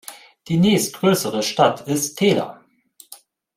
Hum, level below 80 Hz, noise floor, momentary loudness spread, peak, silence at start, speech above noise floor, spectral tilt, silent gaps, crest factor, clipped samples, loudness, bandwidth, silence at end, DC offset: none; -60 dBFS; -52 dBFS; 7 LU; -2 dBFS; 0.1 s; 33 dB; -4.5 dB/octave; none; 18 dB; under 0.1%; -19 LUFS; 16.5 kHz; 0.4 s; under 0.1%